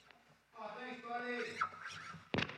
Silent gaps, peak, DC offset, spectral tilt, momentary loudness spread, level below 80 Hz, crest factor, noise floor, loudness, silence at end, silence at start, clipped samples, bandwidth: none; -20 dBFS; under 0.1%; -4.5 dB/octave; 10 LU; -70 dBFS; 24 dB; -66 dBFS; -43 LUFS; 0 s; 0 s; under 0.1%; 13.5 kHz